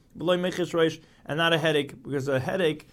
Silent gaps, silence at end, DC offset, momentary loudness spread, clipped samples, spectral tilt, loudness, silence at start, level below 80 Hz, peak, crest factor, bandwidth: none; 0.1 s; under 0.1%; 9 LU; under 0.1%; -5.5 dB/octave; -26 LUFS; 0.15 s; -62 dBFS; -8 dBFS; 18 dB; 15.5 kHz